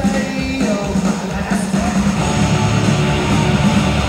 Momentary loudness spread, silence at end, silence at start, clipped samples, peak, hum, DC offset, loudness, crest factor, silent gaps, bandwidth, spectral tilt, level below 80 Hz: 5 LU; 0 s; 0 s; under 0.1%; -2 dBFS; none; under 0.1%; -16 LUFS; 12 dB; none; 15.5 kHz; -5.5 dB/octave; -28 dBFS